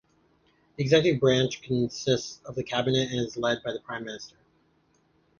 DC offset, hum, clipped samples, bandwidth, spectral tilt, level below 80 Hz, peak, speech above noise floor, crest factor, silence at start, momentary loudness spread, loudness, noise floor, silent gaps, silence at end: under 0.1%; none; under 0.1%; 7.2 kHz; -5 dB/octave; -60 dBFS; -8 dBFS; 40 dB; 20 dB; 0.8 s; 14 LU; -27 LUFS; -67 dBFS; none; 1.1 s